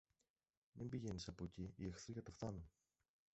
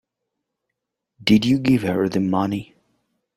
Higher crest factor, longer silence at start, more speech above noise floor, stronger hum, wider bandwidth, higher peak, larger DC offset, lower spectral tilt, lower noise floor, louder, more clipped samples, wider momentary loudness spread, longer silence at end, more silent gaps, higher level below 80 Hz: about the same, 18 dB vs 20 dB; second, 0.75 s vs 1.2 s; second, 39 dB vs 62 dB; neither; second, 8 kHz vs 16 kHz; second, -34 dBFS vs -2 dBFS; neither; about the same, -7 dB/octave vs -6.5 dB/octave; first, -89 dBFS vs -81 dBFS; second, -52 LUFS vs -20 LUFS; neither; about the same, 8 LU vs 9 LU; about the same, 0.65 s vs 0.7 s; neither; second, -66 dBFS vs -54 dBFS